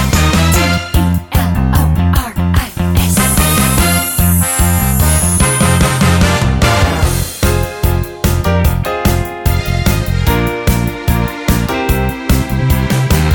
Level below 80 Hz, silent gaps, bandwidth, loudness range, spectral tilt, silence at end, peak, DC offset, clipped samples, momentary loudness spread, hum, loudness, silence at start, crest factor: -18 dBFS; none; 17.5 kHz; 4 LU; -4.5 dB/octave; 0 s; 0 dBFS; under 0.1%; under 0.1%; 5 LU; none; -13 LUFS; 0 s; 12 dB